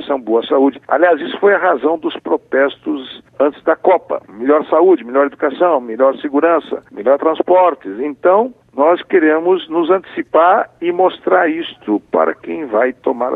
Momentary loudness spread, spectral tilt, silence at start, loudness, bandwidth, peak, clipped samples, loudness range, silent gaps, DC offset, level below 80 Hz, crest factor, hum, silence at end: 8 LU; -7.5 dB/octave; 0 s; -15 LUFS; 4.1 kHz; 0 dBFS; under 0.1%; 2 LU; none; under 0.1%; -64 dBFS; 14 dB; none; 0 s